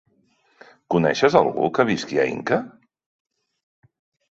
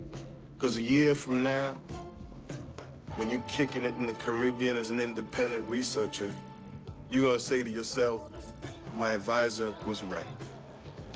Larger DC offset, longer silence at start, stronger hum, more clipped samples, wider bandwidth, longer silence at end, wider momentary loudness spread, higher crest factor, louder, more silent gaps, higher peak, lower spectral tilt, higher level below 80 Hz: neither; first, 0.9 s vs 0 s; neither; neither; about the same, 8 kHz vs 8 kHz; first, 1.6 s vs 0 s; second, 7 LU vs 19 LU; about the same, 22 dB vs 18 dB; first, -20 LUFS vs -31 LUFS; neither; first, -2 dBFS vs -14 dBFS; about the same, -5.5 dB/octave vs -5 dB/octave; second, -62 dBFS vs -56 dBFS